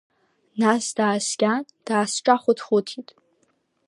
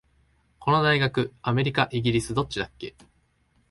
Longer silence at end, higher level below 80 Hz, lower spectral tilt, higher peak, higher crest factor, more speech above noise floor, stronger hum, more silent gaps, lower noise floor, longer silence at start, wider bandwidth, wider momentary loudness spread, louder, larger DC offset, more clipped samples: about the same, 0.85 s vs 0.8 s; second, -78 dBFS vs -52 dBFS; second, -3.5 dB/octave vs -5.5 dB/octave; first, -2 dBFS vs -8 dBFS; about the same, 22 dB vs 20 dB; first, 46 dB vs 42 dB; neither; neither; about the same, -68 dBFS vs -66 dBFS; about the same, 0.55 s vs 0.6 s; about the same, 11.5 kHz vs 11.5 kHz; about the same, 10 LU vs 12 LU; first, -22 LUFS vs -25 LUFS; neither; neither